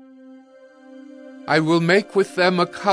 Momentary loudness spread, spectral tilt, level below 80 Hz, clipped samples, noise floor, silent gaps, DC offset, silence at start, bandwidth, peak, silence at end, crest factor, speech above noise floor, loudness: 22 LU; -5.5 dB/octave; -70 dBFS; under 0.1%; -47 dBFS; none; under 0.1%; 0.95 s; 11 kHz; -4 dBFS; 0 s; 18 dB; 29 dB; -19 LUFS